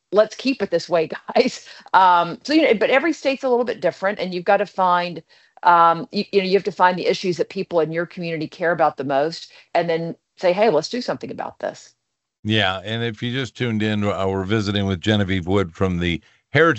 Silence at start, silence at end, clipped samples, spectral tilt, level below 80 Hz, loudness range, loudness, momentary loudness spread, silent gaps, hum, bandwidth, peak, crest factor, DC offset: 0.1 s; 0 s; under 0.1%; -6 dB/octave; -54 dBFS; 5 LU; -20 LUFS; 11 LU; 12.39-12.43 s; none; 8.2 kHz; 0 dBFS; 20 dB; under 0.1%